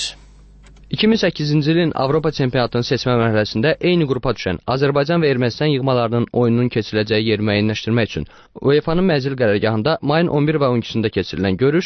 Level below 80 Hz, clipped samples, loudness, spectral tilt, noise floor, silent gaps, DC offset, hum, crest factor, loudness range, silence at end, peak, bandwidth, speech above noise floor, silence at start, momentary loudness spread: -42 dBFS; under 0.1%; -18 LUFS; -6.5 dB/octave; -44 dBFS; none; under 0.1%; none; 14 dB; 1 LU; 0 s; -2 dBFS; 8.6 kHz; 27 dB; 0 s; 4 LU